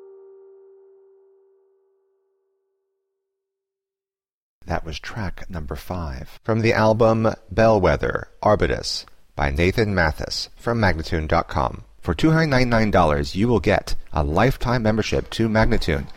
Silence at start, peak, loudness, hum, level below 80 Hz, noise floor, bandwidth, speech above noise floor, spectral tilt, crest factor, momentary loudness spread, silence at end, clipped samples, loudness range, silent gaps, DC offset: 0 s; -6 dBFS; -21 LUFS; none; -32 dBFS; under -90 dBFS; 16 kHz; over 70 dB; -6 dB/octave; 16 dB; 13 LU; 0.05 s; under 0.1%; 14 LU; 4.34-4.61 s; under 0.1%